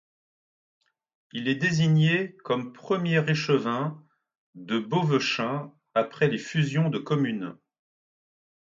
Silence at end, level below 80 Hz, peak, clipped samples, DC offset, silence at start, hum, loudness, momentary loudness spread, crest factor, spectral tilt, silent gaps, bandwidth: 1.2 s; -70 dBFS; -10 dBFS; under 0.1%; under 0.1%; 1.35 s; none; -26 LUFS; 9 LU; 18 dB; -6.5 dB/octave; 4.38-4.53 s; 7.6 kHz